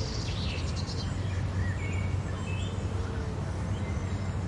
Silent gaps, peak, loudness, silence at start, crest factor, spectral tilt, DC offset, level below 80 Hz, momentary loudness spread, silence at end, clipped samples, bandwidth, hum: none; -20 dBFS; -33 LUFS; 0 s; 12 dB; -6 dB/octave; under 0.1%; -40 dBFS; 2 LU; 0 s; under 0.1%; 11 kHz; none